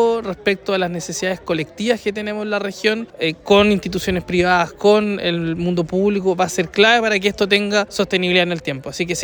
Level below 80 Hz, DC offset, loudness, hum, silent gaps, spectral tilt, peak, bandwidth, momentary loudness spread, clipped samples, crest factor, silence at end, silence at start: -46 dBFS; under 0.1%; -18 LUFS; none; none; -4.5 dB/octave; -2 dBFS; over 20 kHz; 9 LU; under 0.1%; 16 dB; 0 s; 0 s